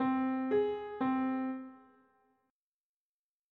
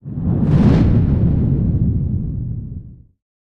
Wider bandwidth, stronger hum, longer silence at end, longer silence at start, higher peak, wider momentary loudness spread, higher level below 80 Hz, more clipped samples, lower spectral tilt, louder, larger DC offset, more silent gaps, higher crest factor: second, 4.3 kHz vs 6 kHz; neither; first, 1.75 s vs 0.65 s; about the same, 0 s vs 0.05 s; second, -22 dBFS vs -2 dBFS; second, 10 LU vs 14 LU; second, -76 dBFS vs -26 dBFS; neither; second, -5 dB/octave vs -10.5 dB/octave; second, -34 LUFS vs -17 LUFS; neither; neither; about the same, 14 dB vs 16 dB